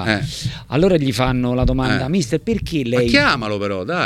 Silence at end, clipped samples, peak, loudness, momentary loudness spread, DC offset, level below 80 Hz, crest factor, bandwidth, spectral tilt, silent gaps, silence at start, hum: 0 s; under 0.1%; 0 dBFS; -18 LUFS; 8 LU; under 0.1%; -30 dBFS; 18 dB; 14.5 kHz; -5.5 dB/octave; none; 0 s; none